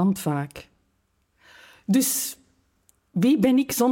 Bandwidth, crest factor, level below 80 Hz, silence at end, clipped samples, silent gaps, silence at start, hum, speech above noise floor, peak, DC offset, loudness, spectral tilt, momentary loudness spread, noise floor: 17 kHz; 18 dB; -62 dBFS; 0 s; under 0.1%; none; 0 s; none; 48 dB; -8 dBFS; under 0.1%; -23 LUFS; -5 dB/octave; 18 LU; -70 dBFS